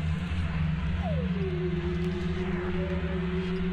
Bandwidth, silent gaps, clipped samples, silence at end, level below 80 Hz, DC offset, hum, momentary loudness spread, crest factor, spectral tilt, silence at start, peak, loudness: 8.4 kHz; none; under 0.1%; 0 s; -38 dBFS; under 0.1%; none; 1 LU; 10 dB; -8.5 dB/octave; 0 s; -18 dBFS; -30 LUFS